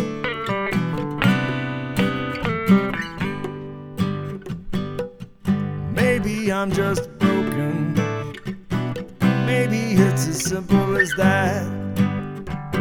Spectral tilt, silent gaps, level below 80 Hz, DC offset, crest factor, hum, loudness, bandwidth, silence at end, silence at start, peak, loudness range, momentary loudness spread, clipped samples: -6 dB/octave; none; -44 dBFS; under 0.1%; 20 dB; none; -22 LUFS; 18.5 kHz; 0 s; 0 s; -2 dBFS; 5 LU; 12 LU; under 0.1%